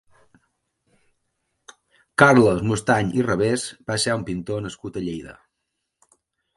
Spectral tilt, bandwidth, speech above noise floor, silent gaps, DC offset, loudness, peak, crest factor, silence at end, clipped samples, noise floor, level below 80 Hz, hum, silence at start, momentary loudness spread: -5 dB/octave; 11.5 kHz; 58 dB; none; under 0.1%; -21 LUFS; 0 dBFS; 24 dB; 1.25 s; under 0.1%; -79 dBFS; -52 dBFS; none; 2.2 s; 16 LU